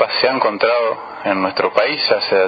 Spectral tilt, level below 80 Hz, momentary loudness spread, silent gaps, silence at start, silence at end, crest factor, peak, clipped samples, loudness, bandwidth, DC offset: -6 dB/octave; -66 dBFS; 6 LU; none; 0 s; 0 s; 16 dB; 0 dBFS; under 0.1%; -17 LUFS; 6 kHz; under 0.1%